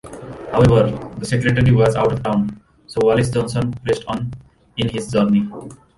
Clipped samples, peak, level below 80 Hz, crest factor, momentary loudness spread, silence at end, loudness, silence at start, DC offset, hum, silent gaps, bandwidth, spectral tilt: under 0.1%; -2 dBFS; -40 dBFS; 16 dB; 14 LU; 0.2 s; -18 LUFS; 0.05 s; under 0.1%; none; none; 11.5 kHz; -7 dB/octave